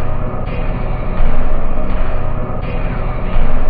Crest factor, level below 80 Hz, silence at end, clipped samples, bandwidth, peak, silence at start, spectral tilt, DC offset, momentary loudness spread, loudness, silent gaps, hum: 10 dB; -14 dBFS; 0 s; under 0.1%; 3.5 kHz; -2 dBFS; 0 s; -11.5 dB/octave; under 0.1%; 3 LU; -21 LUFS; none; none